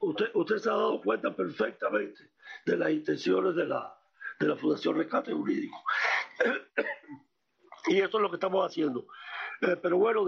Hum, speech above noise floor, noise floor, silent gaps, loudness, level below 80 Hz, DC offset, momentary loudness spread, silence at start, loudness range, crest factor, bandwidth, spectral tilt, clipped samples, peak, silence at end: none; 28 dB; -57 dBFS; none; -30 LUFS; -78 dBFS; under 0.1%; 11 LU; 0 s; 1 LU; 16 dB; 7 kHz; -3.5 dB/octave; under 0.1%; -12 dBFS; 0 s